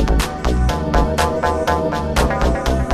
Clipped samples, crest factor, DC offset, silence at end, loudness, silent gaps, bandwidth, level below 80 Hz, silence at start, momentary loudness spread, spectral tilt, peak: under 0.1%; 16 dB; under 0.1%; 0 s; -18 LUFS; none; 14 kHz; -20 dBFS; 0 s; 2 LU; -5.5 dB/octave; -2 dBFS